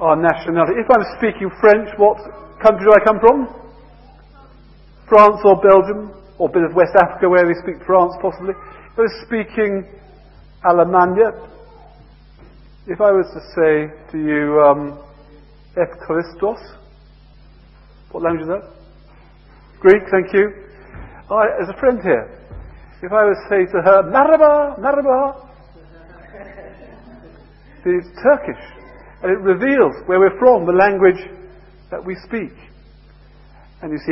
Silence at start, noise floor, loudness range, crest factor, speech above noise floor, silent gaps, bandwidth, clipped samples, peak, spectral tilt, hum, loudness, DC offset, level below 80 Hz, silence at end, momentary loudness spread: 0 s; -45 dBFS; 9 LU; 16 dB; 30 dB; none; 5.8 kHz; under 0.1%; 0 dBFS; -9 dB/octave; none; -15 LUFS; under 0.1%; -44 dBFS; 0 s; 17 LU